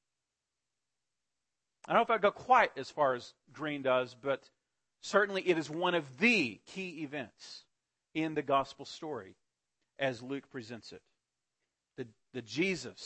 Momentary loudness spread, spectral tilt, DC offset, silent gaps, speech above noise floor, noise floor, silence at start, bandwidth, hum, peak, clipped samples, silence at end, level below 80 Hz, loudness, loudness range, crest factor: 20 LU; -4.5 dB/octave; under 0.1%; none; 56 dB; -89 dBFS; 1.9 s; 8.4 kHz; none; -12 dBFS; under 0.1%; 0 s; -74 dBFS; -32 LUFS; 11 LU; 22 dB